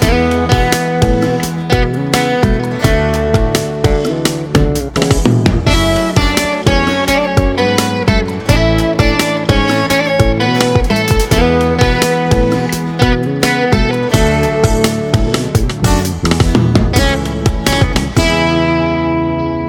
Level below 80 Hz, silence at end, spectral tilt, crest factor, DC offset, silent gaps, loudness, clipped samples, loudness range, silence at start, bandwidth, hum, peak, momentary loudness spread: -20 dBFS; 0 s; -5.5 dB/octave; 12 dB; under 0.1%; none; -13 LUFS; 0.2%; 1 LU; 0 s; 19 kHz; none; 0 dBFS; 3 LU